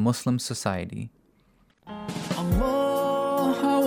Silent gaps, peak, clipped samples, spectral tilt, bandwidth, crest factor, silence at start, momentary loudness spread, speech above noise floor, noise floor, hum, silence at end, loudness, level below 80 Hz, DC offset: none; -8 dBFS; under 0.1%; -6 dB/octave; 19 kHz; 18 dB; 0 s; 15 LU; 37 dB; -62 dBFS; none; 0 s; -26 LUFS; -40 dBFS; under 0.1%